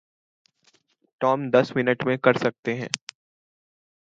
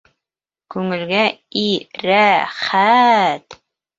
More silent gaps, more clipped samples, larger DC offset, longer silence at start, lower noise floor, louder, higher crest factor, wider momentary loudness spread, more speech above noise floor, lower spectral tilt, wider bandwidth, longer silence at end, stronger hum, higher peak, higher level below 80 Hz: first, 2.59-2.63 s vs none; neither; neither; first, 1.2 s vs 0.7 s; second, -65 dBFS vs -88 dBFS; second, -23 LUFS vs -16 LUFS; first, 24 dB vs 16 dB; about the same, 10 LU vs 11 LU; second, 42 dB vs 72 dB; about the same, -5 dB/octave vs -5 dB/octave; first, 9.2 kHz vs 7.8 kHz; first, 1.15 s vs 0.45 s; neither; about the same, -2 dBFS vs -2 dBFS; second, -70 dBFS vs -64 dBFS